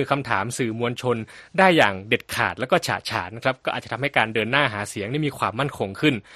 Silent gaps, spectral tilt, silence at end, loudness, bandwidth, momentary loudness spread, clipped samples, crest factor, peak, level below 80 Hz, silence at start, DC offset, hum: none; -4.5 dB/octave; 0 s; -23 LUFS; 13 kHz; 9 LU; under 0.1%; 22 dB; -2 dBFS; -58 dBFS; 0 s; under 0.1%; none